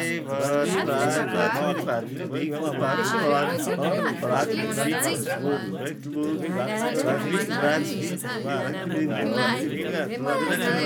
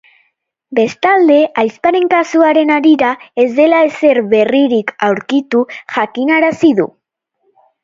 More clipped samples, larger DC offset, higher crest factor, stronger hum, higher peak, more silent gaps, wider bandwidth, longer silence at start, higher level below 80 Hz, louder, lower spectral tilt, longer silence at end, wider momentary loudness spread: neither; neither; about the same, 16 dB vs 12 dB; neither; second, -10 dBFS vs 0 dBFS; neither; first, over 20 kHz vs 7.6 kHz; second, 0 s vs 0.7 s; second, -78 dBFS vs -60 dBFS; second, -25 LUFS vs -12 LUFS; about the same, -4.5 dB/octave vs -5.5 dB/octave; second, 0 s vs 0.95 s; about the same, 5 LU vs 6 LU